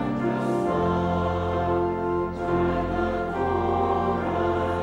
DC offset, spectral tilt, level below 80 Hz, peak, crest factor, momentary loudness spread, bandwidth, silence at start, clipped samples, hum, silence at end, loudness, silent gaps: under 0.1%; -8 dB/octave; -40 dBFS; -10 dBFS; 14 dB; 2 LU; 10.5 kHz; 0 s; under 0.1%; none; 0 s; -25 LUFS; none